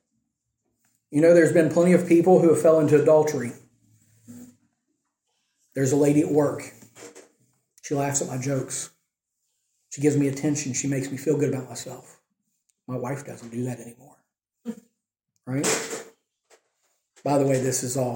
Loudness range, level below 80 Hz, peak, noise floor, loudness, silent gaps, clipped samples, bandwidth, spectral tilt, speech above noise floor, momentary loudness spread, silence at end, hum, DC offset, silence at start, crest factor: 13 LU; -68 dBFS; -6 dBFS; -79 dBFS; -22 LUFS; none; under 0.1%; 17 kHz; -5.5 dB/octave; 57 dB; 21 LU; 0 s; none; under 0.1%; 1.1 s; 20 dB